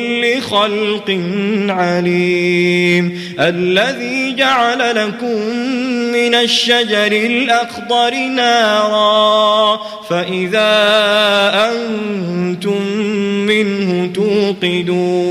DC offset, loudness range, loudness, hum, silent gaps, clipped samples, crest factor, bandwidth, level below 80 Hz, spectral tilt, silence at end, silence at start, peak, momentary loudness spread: under 0.1%; 3 LU; -13 LUFS; none; none; under 0.1%; 12 dB; 15 kHz; -58 dBFS; -4.5 dB/octave; 0 s; 0 s; -2 dBFS; 7 LU